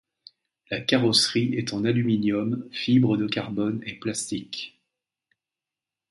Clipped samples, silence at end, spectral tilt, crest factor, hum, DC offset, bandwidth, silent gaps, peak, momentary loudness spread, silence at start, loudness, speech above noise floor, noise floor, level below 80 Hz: under 0.1%; 1.45 s; -4.5 dB/octave; 20 dB; none; under 0.1%; 11.5 kHz; none; -6 dBFS; 12 LU; 0.7 s; -24 LUFS; 65 dB; -89 dBFS; -62 dBFS